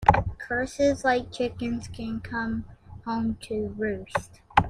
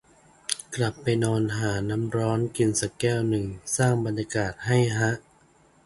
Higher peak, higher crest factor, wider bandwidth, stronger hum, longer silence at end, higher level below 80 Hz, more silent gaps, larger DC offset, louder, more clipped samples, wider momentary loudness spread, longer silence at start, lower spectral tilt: about the same, -2 dBFS vs -2 dBFS; about the same, 26 dB vs 24 dB; about the same, 12.5 kHz vs 11.5 kHz; neither; second, 0 s vs 0.65 s; first, -44 dBFS vs -52 dBFS; neither; neither; about the same, -28 LUFS vs -26 LUFS; neither; first, 10 LU vs 6 LU; second, 0 s vs 0.5 s; about the same, -6 dB/octave vs -5 dB/octave